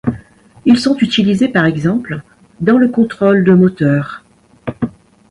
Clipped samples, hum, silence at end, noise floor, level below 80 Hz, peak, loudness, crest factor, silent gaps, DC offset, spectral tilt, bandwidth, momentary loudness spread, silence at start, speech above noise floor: under 0.1%; none; 0.4 s; -40 dBFS; -46 dBFS; 0 dBFS; -13 LUFS; 14 dB; none; under 0.1%; -7 dB/octave; 11.5 kHz; 17 LU; 0.05 s; 28 dB